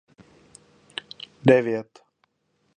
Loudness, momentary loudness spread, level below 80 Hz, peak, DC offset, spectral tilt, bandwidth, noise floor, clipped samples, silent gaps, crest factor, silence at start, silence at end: -22 LUFS; 19 LU; -68 dBFS; -2 dBFS; under 0.1%; -7 dB/octave; 10 kHz; -71 dBFS; under 0.1%; none; 24 dB; 1.45 s; 0.95 s